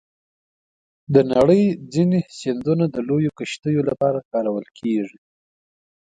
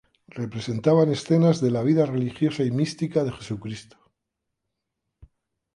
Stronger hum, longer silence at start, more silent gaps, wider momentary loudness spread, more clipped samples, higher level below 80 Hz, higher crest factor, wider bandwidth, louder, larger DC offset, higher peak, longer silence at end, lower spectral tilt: neither; first, 1.1 s vs 0.35 s; first, 3.59-3.63 s, 4.25-4.31 s vs none; second, 10 LU vs 14 LU; neither; about the same, -56 dBFS vs -60 dBFS; about the same, 18 dB vs 18 dB; second, 9.4 kHz vs 11 kHz; first, -20 LUFS vs -23 LUFS; neither; first, -2 dBFS vs -8 dBFS; first, 1.05 s vs 0.5 s; about the same, -7.5 dB/octave vs -7.5 dB/octave